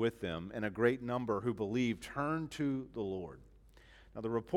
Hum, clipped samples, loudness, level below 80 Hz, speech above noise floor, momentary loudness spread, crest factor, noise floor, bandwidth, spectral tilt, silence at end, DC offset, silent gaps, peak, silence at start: none; under 0.1%; -37 LUFS; -62 dBFS; 24 dB; 9 LU; 20 dB; -60 dBFS; 14.5 kHz; -6.5 dB/octave; 0 s; under 0.1%; none; -16 dBFS; 0 s